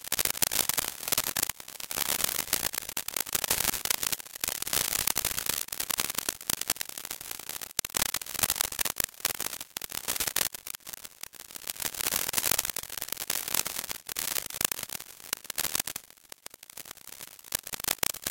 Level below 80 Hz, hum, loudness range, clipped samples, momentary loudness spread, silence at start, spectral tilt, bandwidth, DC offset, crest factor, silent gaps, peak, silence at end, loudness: -58 dBFS; none; 5 LU; under 0.1%; 14 LU; 0 s; 0 dB/octave; 17.5 kHz; under 0.1%; 32 dB; none; -2 dBFS; 0 s; -29 LUFS